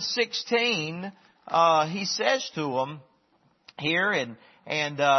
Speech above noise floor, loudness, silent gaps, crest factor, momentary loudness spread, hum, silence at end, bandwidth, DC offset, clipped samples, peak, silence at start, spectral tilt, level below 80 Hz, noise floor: 40 dB; -26 LUFS; none; 18 dB; 13 LU; none; 0 s; 6.4 kHz; under 0.1%; under 0.1%; -8 dBFS; 0 s; -3.5 dB/octave; -74 dBFS; -66 dBFS